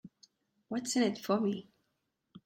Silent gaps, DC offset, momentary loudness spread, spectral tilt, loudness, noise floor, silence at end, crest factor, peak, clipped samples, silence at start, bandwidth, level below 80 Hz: none; under 0.1%; 9 LU; -4.5 dB/octave; -33 LUFS; -82 dBFS; 0.05 s; 20 dB; -16 dBFS; under 0.1%; 0.05 s; 16 kHz; -78 dBFS